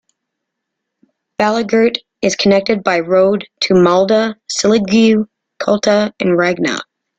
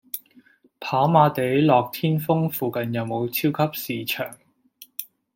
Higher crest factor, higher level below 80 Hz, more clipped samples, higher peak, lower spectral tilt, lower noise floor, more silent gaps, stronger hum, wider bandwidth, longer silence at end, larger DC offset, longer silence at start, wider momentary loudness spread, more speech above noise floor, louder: second, 14 dB vs 20 dB; first, -54 dBFS vs -66 dBFS; neither; about the same, -2 dBFS vs -4 dBFS; second, -4.5 dB/octave vs -6.5 dB/octave; first, -76 dBFS vs -56 dBFS; neither; neither; second, 9.2 kHz vs 17 kHz; about the same, 0.35 s vs 0.3 s; neither; first, 1.4 s vs 0.15 s; second, 7 LU vs 17 LU; first, 64 dB vs 34 dB; first, -14 LUFS vs -22 LUFS